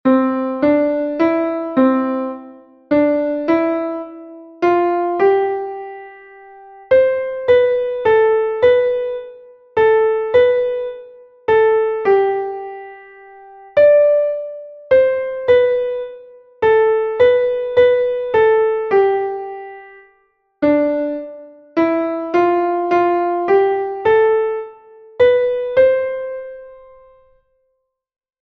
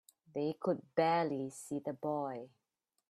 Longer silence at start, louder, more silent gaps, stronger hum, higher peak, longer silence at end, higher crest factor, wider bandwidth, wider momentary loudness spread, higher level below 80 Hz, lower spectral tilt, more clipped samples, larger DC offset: second, 0.05 s vs 0.35 s; first, -16 LUFS vs -37 LUFS; neither; neither; first, -2 dBFS vs -18 dBFS; first, 1.65 s vs 0.65 s; second, 14 dB vs 20 dB; second, 5.8 kHz vs 13.5 kHz; about the same, 15 LU vs 13 LU; first, -54 dBFS vs -82 dBFS; first, -7.5 dB/octave vs -6 dB/octave; neither; neither